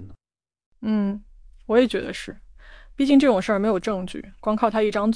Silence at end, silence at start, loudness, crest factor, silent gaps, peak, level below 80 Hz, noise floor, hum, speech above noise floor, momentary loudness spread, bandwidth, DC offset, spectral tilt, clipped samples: 0 s; 0 s; -22 LUFS; 18 dB; 0.66-0.72 s; -6 dBFS; -48 dBFS; under -90 dBFS; none; over 69 dB; 16 LU; 10.5 kHz; under 0.1%; -6 dB/octave; under 0.1%